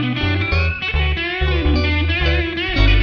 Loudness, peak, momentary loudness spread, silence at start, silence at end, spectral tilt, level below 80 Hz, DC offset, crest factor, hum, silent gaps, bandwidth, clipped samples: -18 LUFS; -2 dBFS; 2 LU; 0 s; 0 s; -7 dB/octave; -22 dBFS; under 0.1%; 14 dB; none; none; 6.4 kHz; under 0.1%